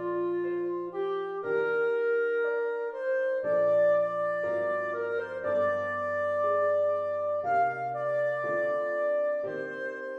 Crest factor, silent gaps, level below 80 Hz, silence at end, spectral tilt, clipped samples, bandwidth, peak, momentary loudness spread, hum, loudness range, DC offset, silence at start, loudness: 12 dB; none; -78 dBFS; 0 s; -7 dB/octave; under 0.1%; 6.2 kHz; -16 dBFS; 6 LU; none; 2 LU; under 0.1%; 0 s; -29 LUFS